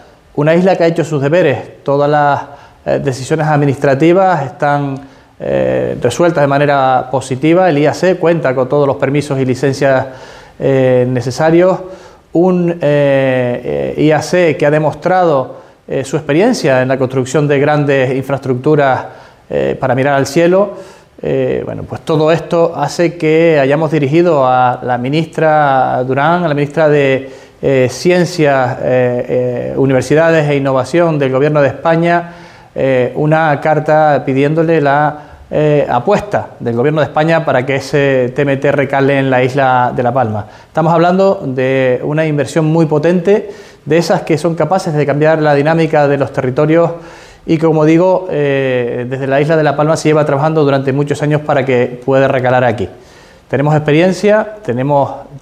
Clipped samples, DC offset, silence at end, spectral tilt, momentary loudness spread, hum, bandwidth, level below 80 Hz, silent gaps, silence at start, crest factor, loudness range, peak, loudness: under 0.1%; under 0.1%; 0.05 s; -7 dB/octave; 8 LU; none; 13.5 kHz; -46 dBFS; none; 0.35 s; 12 dB; 2 LU; 0 dBFS; -12 LUFS